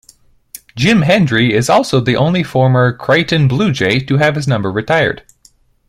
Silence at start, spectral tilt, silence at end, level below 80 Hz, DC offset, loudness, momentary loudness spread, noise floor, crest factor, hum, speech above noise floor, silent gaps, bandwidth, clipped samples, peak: 0.75 s; -6 dB/octave; 0.7 s; -44 dBFS; under 0.1%; -13 LUFS; 5 LU; -51 dBFS; 14 dB; none; 38 dB; none; 15.5 kHz; under 0.1%; 0 dBFS